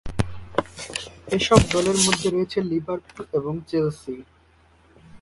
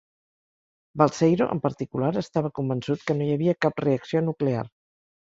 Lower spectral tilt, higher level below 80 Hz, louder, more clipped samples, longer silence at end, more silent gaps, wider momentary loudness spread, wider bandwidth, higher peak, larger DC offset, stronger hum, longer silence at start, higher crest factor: second, -4.5 dB/octave vs -7.5 dB/octave; first, -40 dBFS vs -62 dBFS; about the same, -23 LUFS vs -25 LUFS; neither; second, 0.05 s vs 0.55 s; neither; first, 15 LU vs 7 LU; first, 11.5 kHz vs 7.8 kHz; first, 0 dBFS vs -4 dBFS; neither; neither; second, 0.05 s vs 0.95 s; about the same, 24 dB vs 22 dB